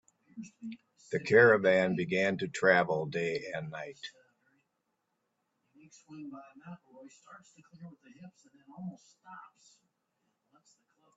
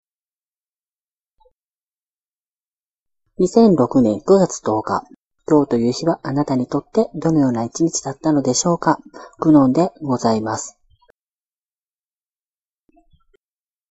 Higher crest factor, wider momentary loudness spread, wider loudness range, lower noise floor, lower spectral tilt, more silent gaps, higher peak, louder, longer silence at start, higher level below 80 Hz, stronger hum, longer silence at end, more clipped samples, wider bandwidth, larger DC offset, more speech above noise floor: about the same, 24 dB vs 20 dB; first, 29 LU vs 8 LU; first, 25 LU vs 7 LU; second, -82 dBFS vs under -90 dBFS; about the same, -5.5 dB/octave vs -6 dB/octave; second, none vs 5.16-5.30 s; second, -10 dBFS vs 0 dBFS; second, -28 LUFS vs -18 LUFS; second, 0.35 s vs 3.4 s; second, -76 dBFS vs -56 dBFS; neither; second, 1.7 s vs 3.2 s; neither; about the same, 8 kHz vs 8.2 kHz; neither; second, 50 dB vs over 73 dB